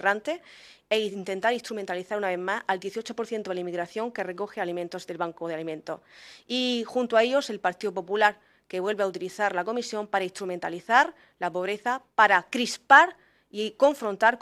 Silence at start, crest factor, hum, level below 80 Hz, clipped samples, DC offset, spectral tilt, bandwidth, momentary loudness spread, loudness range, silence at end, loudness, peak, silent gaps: 0 s; 24 dB; none; -74 dBFS; under 0.1%; under 0.1%; -3.5 dB/octave; 15 kHz; 12 LU; 9 LU; 0.05 s; -26 LUFS; -2 dBFS; none